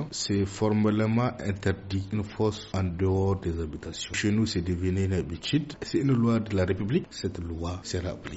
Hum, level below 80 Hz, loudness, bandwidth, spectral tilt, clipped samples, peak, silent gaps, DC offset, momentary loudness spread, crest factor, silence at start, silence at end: none; -48 dBFS; -28 LUFS; 8 kHz; -6 dB/octave; under 0.1%; -14 dBFS; none; under 0.1%; 9 LU; 14 dB; 0 s; 0 s